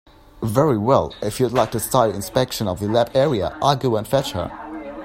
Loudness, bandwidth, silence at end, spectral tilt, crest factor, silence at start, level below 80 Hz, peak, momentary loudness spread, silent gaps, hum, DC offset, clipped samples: -20 LUFS; 16.5 kHz; 0 s; -5.5 dB/octave; 20 dB; 0.35 s; -46 dBFS; 0 dBFS; 10 LU; none; none; under 0.1%; under 0.1%